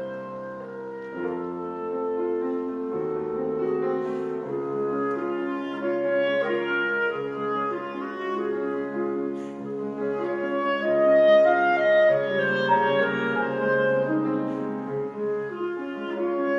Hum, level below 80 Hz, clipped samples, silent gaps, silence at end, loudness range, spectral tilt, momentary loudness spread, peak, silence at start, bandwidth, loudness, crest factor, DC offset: none; -70 dBFS; under 0.1%; none; 0 s; 8 LU; -7.5 dB/octave; 12 LU; -8 dBFS; 0 s; 7.2 kHz; -25 LUFS; 16 dB; under 0.1%